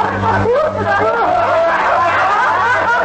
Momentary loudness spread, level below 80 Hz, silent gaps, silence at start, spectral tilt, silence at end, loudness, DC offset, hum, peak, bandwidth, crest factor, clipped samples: 2 LU; -42 dBFS; none; 0 s; -5.5 dB/octave; 0 s; -13 LUFS; under 0.1%; none; -4 dBFS; 8.6 kHz; 10 dB; under 0.1%